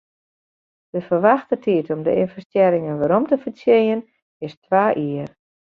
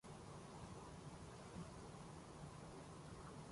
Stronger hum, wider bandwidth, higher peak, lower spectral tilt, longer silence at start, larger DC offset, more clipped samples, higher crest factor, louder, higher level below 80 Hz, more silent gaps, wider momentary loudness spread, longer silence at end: neither; second, 5.4 kHz vs 11.5 kHz; first, -2 dBFS vs -42 dBFS; first, -9 dB/octave vs -5.5 dB/octave; first, 0.95 s vs 0.05 s; neither; neither; about the same, 18 dB vs 14 dB; first, -19 LUFS vs -56 LUFS; first, -62 dBFS vs -68 dBFS; first, 2.45-2.50 s, 4.22-4.40 s, 4.57-4.62 s vs none; first, 13 LU vs 2 LU; first, 0.4 s vs 0 s